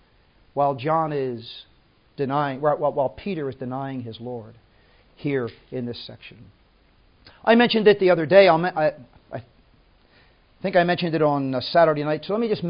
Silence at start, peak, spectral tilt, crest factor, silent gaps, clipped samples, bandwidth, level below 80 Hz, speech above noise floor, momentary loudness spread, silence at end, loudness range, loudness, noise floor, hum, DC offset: 0.55 s; -2 dBFS; -10.5 dB/octave; 22 dB; none; under 0.1%; 5.4 kHz; -60 dBFS; 36 dB; 20 LU; 0 s; 12 LU; -21 LUFS; -58 dBFS; none; under 0.1%